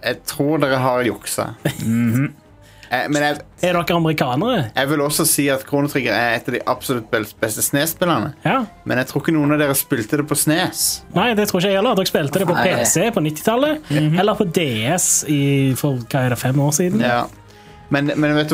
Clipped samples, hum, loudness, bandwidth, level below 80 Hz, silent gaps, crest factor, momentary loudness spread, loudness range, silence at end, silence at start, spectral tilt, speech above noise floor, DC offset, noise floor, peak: under 0.1%; none; -18 LUFS; 16.5 kHz; -50 dBFS; none; 16 dB; 6 LU; 3 LU; 0 s; 0 s; -4.5 dB/octave; 24 dB; under 0.1%; -42 dBFS; -2 dBFS